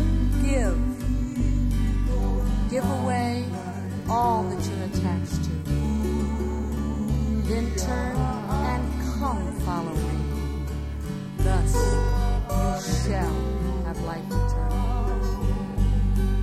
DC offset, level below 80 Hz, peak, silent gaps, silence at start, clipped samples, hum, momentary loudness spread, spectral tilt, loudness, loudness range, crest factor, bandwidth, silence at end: under 0.1%; -26 dBFS; -10 dBFS; none; 0 s; under 0.1%; none; 5 LU; -6.5 dB/octave; -26 LUFS; 1 LU; 14 dB; 14.5 kHz; 0 s